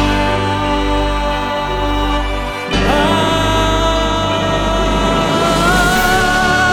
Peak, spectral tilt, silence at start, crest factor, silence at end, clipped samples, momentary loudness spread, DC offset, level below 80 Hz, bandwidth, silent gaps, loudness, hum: 0 dBFS; -4.5 dB/octave; 0 s; 14 dB; 0 s; under 0.1%; 6 LU; under 0.1%; -22 dBFS; 19 kHz; none; -14 LUFS; 50 Hz at -25 dBFS